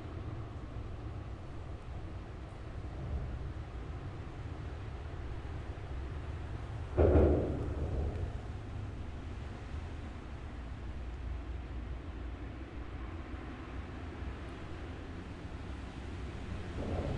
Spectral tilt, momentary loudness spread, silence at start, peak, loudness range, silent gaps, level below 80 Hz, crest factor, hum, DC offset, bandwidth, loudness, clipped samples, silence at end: -8.5 dB/octave; 8 LU; 0 s; -14 dBFS; 10 LU; none; -44 dBFS; 24 dB; none; under 0.1%; 9.2 kHz; -40 LUFS; under 0.1%; 0 s